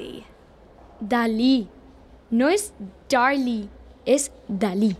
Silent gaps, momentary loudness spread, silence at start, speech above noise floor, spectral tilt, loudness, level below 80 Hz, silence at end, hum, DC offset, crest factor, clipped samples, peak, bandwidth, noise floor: none; 19 LU; 0 s; 28 dB; -4.5 dB/octave; -23 LUFS; -52 dBFS; 0 s; none; under 0.1%; 18 dB; under 0.1%; -6 dBFS; 15 kHz; -50 dBFS